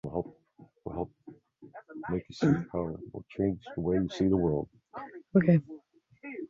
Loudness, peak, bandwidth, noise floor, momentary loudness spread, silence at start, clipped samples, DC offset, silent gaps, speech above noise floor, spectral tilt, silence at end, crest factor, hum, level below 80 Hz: -30 LUFS; -12 dBFS; 7.4 kHz; -59 dBFS; 20 LU; 0.05 s; under 0.1%; under 0.1%; none; 31 dB; -8.5 dB/octave; 0.05 s; 20 dB; none; -54 dBFS